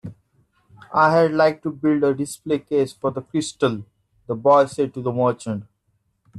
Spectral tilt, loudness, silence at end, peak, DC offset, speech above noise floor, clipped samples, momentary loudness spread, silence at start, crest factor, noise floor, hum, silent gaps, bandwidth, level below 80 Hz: -6 dB/octave; -21 LUFS; 0 s; -4 dBFS; under 0.1%; 49 dB; under 0.1%; 13 LU; 0.05 s; 18 dB; -69 dBFS; none; none; 13 kHz; -62 dBFS